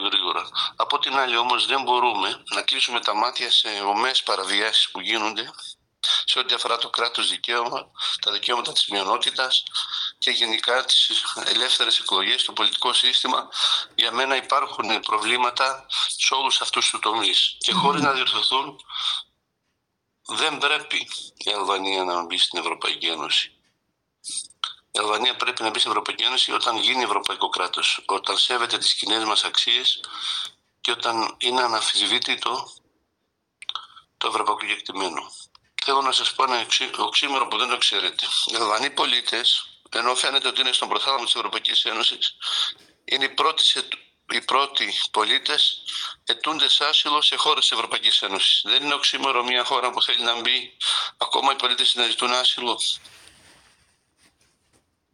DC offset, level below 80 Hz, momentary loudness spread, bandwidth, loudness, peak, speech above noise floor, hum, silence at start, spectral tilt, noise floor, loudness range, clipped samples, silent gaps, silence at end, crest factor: under 0.1%; -76 dBFS; 9 LU; 16 kHz; -21 LUFS; -6 dBFS; 53 dB; none; 0 s; -0.5 dB/octave; -76 dBFS; 5 LU; under 0.1%; none; 2.05 s; 18 dB